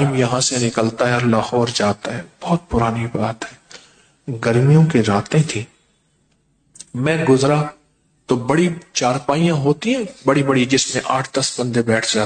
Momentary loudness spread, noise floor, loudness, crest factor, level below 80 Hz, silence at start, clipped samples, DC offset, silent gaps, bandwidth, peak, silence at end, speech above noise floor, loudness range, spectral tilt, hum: 10 LU; -62 dBFS; -18 LUFS; 14 dB; -46 dBFS; 0 s; under 0.1%; under 0.1%; none; 9.4 kHz; -4 dBFS; 0 s; 44 dB; 3 LU; -5 dB/octave; none